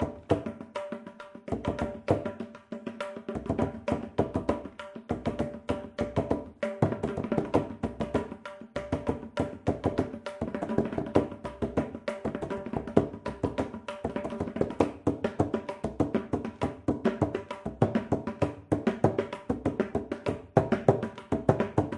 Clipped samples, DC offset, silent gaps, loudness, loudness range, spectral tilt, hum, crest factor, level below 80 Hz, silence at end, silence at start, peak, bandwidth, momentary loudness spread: under 0.1%; under 0.1%; none; -31 LUFS; 4 LU; -8 dB/octave; none; 28 dB; -52 dBFS; 0 s; 0 s; -4 dBFS; 11.5 kHz; 10 LU